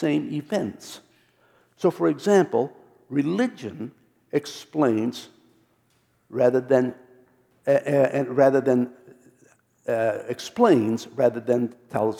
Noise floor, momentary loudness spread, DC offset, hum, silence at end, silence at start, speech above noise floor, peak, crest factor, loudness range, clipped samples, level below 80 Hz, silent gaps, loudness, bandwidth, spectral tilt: -66 dBFS; 15 LU; under 0.1%; none; 0 s; 0 s; 43 dB; -4 dBFS; 20 dB; 5 LU; under 0.1%; -74 dBFS; none; -23 LUFS; 16 kHz; -6.5 dB/octave